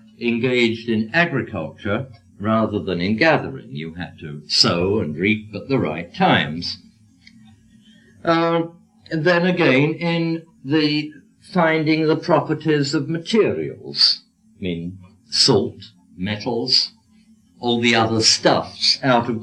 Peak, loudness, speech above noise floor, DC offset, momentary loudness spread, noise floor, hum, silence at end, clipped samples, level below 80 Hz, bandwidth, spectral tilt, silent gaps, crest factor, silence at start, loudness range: 0 dBFS; -19 LUFS; 34 dB; under 0.1%; 14 LU; -53 dBFS; none; 0 s; under 0.1%; -58 dBFS; 11 kHz; -4.5 dB/octave; none; 20 dB; 0.2 s; 4 LU